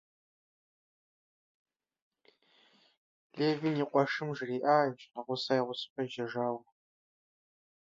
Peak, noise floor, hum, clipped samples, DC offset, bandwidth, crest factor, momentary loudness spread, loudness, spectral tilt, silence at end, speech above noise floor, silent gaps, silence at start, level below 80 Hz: -12 dBFS; -68 dBFS; none; under 0.1%; under 0.1%; 7.8 kHz; 22 dB; 10 LU; -33 LUFS; -6.5 dB/octave; 1.25 s; 36 dB; 5.90-5.96 s; 3.35 s; -84 dBFS